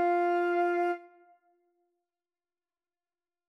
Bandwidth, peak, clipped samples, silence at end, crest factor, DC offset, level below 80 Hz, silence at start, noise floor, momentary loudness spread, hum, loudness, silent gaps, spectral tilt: 6 kHz; -20 dBFS; under 0.1%; 2.4 s; 12 dB; under 0.1%; under -90 dBFS; 0 s; under -90 dBFS; 7 LU; none; -29 LUFS; none; -4 dB/octave